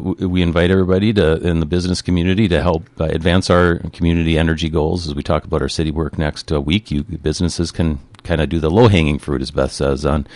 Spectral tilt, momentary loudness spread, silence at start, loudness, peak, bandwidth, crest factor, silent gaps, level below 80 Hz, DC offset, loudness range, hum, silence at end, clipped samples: -6.5 dB/octave; 7 LU; 0 s; -17 LUFS; -2 dBFS; 11.5 kHz; 14 dB; none; -26 dBFS; under 0.1%; 4 LU; none; 0 s; under 0.1%